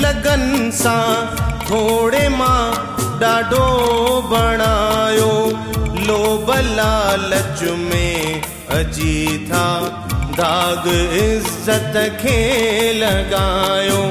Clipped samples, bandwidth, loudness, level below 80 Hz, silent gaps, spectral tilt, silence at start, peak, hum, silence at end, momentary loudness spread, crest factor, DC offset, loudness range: under 0.1%; 16 kHz; -16 LUFS; -26 dBFS; none; -4.5 dB/octave; 0 s; -2 dBFS; none; 0 s; 6 LU; 14 dB; under 0.1%; 3 LU